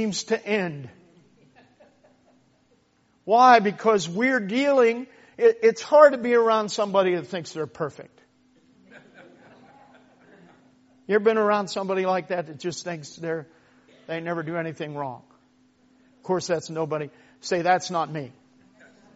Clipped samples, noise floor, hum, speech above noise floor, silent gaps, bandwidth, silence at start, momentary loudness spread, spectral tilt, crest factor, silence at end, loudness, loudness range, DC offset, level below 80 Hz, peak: under 0.1%; -64 dBFS; none; 42 dB; none; 8 kHz; 0 s; 17 LU; -3.5 dB/octave; 22 dB; 0.85 s; -23 LUFS; 13 LU; under 0.1%; -74 dBFS; -2 dBFS